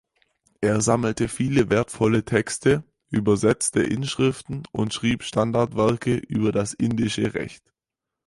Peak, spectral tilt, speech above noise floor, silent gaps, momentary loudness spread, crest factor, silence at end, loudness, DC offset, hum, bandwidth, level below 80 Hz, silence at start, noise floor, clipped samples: -6 dBFS; -5.5 dB/octave; 64 dB; none; 7 LU; 18 dB; 0.75 s; -23 LUFS; under 0.1%; none; 11.5 kHz; -50 dBFS; 0.6 s; -86 dBFS; under 0.1%